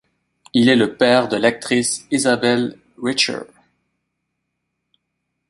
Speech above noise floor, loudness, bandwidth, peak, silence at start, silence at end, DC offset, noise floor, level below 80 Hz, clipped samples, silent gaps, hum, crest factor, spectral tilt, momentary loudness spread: 59 dB; -17 LUFS; 11.5 kHz; -2 dBFS; 0.55 s; 2.05 s; under 0.1%; -76 dBFS; -60 dBFS; under 0.1%; none; none; 18 dB; -3.5 dB/octave; 8 LU